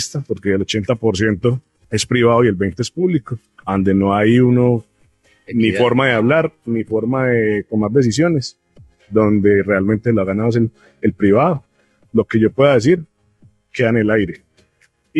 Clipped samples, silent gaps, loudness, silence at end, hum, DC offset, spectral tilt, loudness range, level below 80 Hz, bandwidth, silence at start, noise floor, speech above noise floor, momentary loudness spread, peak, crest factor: under 0.1%; none; -16 LUFS; 0 s; none; under 0.1%; -6.5 dB/octave; 2 LU; -50 dBFS; 12 kHz; 0 s; -59 dBFS; 44 dB; 9 LU; -2 dBFS; 16 dB